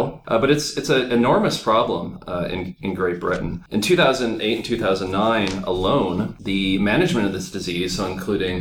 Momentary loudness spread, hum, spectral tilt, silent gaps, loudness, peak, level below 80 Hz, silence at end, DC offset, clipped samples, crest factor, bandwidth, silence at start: 8 LU; none; -5 dB/octave; none; -21 LUFS; -4 dBFS; -42 dBFS; 0 s; under 0.1%; under 0.1%; 16 dB; 18 kHz; 0 s